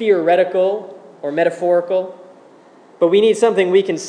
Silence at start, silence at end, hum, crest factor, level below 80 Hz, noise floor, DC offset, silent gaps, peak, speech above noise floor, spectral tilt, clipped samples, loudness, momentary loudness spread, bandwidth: 0 s; 0 s; none; 14 dB; -84 dBFS; -46 dBFS; under 0.1%; none; -2 dBFS; 30 dB; -5 dB/octave; under 0.1%; -16 LUFS; 13 LU; 10 kHz